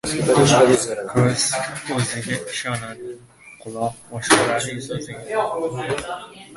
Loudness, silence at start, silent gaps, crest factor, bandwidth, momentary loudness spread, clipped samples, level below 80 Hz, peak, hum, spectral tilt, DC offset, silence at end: -20 LUFS; 0.05 s; none; 20 dB; 12 kHz; 19 LU; under 0.1%; -52 dBFS; 0 dBFS; none; -4 dB/octave; under 0.1%; 0 s